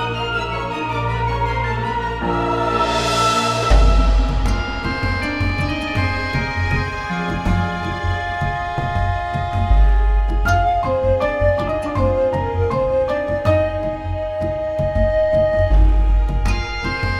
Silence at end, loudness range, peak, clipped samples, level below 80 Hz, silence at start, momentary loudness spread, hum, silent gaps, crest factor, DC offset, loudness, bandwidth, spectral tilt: 0 s; 3 LU; 0 dBFS; under 0.1%; -22 dBFS; 0 s; 6 LU; none; none; 16 dB; under 0.1%; -19 LUFS; 11 kHz; -6 dB/octave